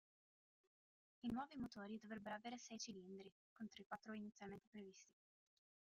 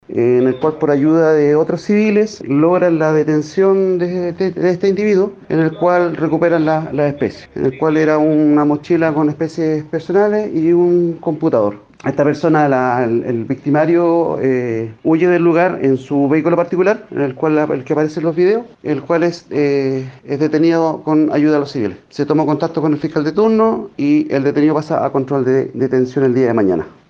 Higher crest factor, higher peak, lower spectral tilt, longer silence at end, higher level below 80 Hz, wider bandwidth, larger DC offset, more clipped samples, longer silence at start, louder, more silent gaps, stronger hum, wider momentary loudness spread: first, 18 dB vs 12 dB; second, -36 dBFS vs -2 dBFS; second, -4 dB/octave vs -8 dB/octave; first, 0.85 s vs 0.2 s; second, -82 dBFS vs -56 dBFS; first, 11.5 kHz vs 7.2 kHz; neither; neither; first, 1.25 s vs 0.1 s; second, -54 LUFS vs -15 LUFS; first, 3.32-3.56 s, 3.86-3.90 s, 4.67-4.73 s vs none; neither; first, 11 LU vs 6 LU